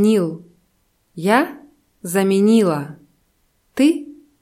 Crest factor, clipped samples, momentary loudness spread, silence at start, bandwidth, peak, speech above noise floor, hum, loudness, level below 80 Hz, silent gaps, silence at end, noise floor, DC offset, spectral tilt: 18 dB; under 0.1%; 21 LU; 0 s; 15.5 kHz; -2 dBFS; 48 dB; none; -18 LUFS; -66 dBFS; none; 0.3 s; -64 dBFS; under 0.1%; -6 dB/octave